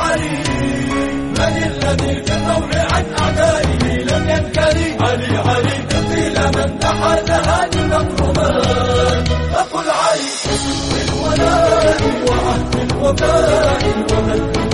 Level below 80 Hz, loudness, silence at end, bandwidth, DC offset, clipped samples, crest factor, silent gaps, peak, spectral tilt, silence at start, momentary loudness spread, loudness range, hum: -26 dBFS; -15 LUFS; 0 s; 11.5 kHz; 1%; under 0.1%; 14 dB; none; -2 dBFS; -5 dB/octave; 0 s; 4 LU; 2 LU; none